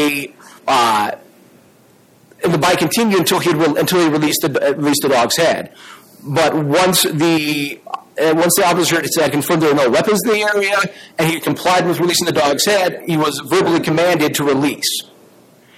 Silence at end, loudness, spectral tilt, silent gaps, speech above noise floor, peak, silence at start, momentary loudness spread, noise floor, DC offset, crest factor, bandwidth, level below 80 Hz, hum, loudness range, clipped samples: 0.75 s; -15 LUFS; -4 dB/octave; none; 34 dB; -2 dBFS; 0 s; 8 LU; -49 dBFS; under 0.1%; 14 dB; 17 kHz; -56 dBFS; none; 2 LU; under 0.1%